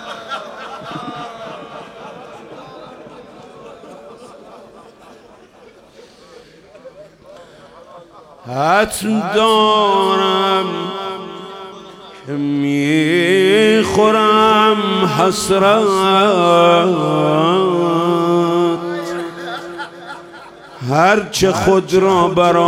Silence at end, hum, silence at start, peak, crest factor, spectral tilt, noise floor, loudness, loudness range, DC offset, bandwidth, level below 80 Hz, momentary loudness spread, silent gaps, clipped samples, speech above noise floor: 0 s; none; 0 s; -2 dBFS; 14 dB; -5 dB/octave; -44 dBFS; -14 LUFS; 19 LU; under 0.1%; 16.5 kHz; -50 dBFS; 22 LU; none; under 0.1%; 31 dB